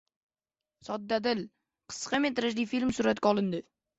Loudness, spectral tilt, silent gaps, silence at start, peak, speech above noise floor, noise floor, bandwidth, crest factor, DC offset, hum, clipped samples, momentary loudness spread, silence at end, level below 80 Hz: -30 LUFS; -4.5 dB/octave; none; 0.85 s; -12 dBFS; over 60 dB; under -90 dBFS; 8.2 kHz; 20 dB; under 0.1%; none; under 0.1%; 12 LU; 0.35 s; -64 dBFS